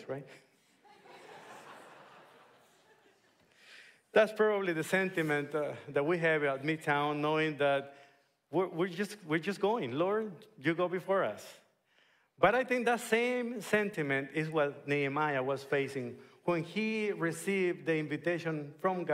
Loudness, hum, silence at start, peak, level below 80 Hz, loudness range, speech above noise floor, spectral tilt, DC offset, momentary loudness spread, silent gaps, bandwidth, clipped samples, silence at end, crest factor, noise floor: -32 LUFS; none; 0 s; -12 dBFS; -76 dBFS; 3 LU; 37 dB; -5.5 dB/octave; under 0.1%; 12 LU; none; 16 kHz; under 0.1%; 0 s; 22 dB; -70 dBFS